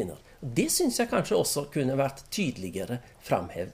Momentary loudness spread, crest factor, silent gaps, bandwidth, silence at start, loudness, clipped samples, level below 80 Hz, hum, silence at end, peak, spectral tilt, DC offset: 11 LU; 16 dB; none; 15.5 kHz; 0 s; -29 LUFS; under 0.1%; -54 dBFS; none; 0 s; -12 dBFS; -4 dB/octave; under 0.1%